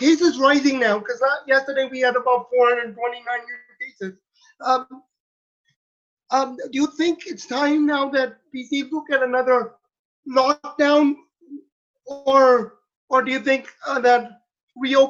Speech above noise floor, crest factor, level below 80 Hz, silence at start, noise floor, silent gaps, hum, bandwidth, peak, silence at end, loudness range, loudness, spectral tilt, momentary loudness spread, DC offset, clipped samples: 32 dB; 18 dB; -70 dBFS; 0 s; -52 dBFS; 5.20-5.64 s, 5.76-6.17 s, 9.99-10.23 s, 11.72-11.94 s, 12.96-13.08 s, 14.63-14.67 s; none; 7.6 kHz; -4 dBFS; 0 s; 7 LU; -20 LUFS; -3.5 dB/octave; 15 LU; under 0.1%; under 0.1%